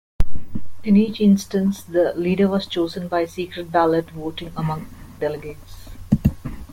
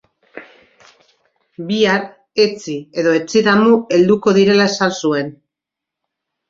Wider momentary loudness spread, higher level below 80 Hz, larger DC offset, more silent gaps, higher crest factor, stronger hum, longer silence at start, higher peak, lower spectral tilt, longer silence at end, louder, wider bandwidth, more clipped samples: first, 18 LU vs 12 LU; first, -34 dBFS vs -60 dBFS; neither; neither; about the same, 18 dB vs 16 dB; neither; second, 0.2 s vs 0.35 s; about the same, -2 dBFS vs -2 dBFS; first, -7 dB/octave vs -5 dB/octave; second, 0 s vs 1.2 s; second, -21 LUFS vs -15 LUFS; first, 16 kHz vs 7.8 kHz; neither